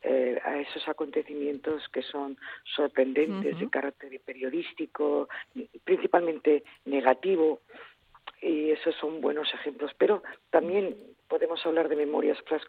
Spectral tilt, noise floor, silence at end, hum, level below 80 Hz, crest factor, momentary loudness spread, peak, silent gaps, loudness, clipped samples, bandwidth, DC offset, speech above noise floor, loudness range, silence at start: -7 dB/octave; -50 dBFS; 0.05 s; none; -74 dBFS; 22 dB; 11 LU; -8 dBFS; none; -29 LUFS; under 0.1%; 4.8 kHz; under 0.1%; 22 dB; 3 LU; 0.05 s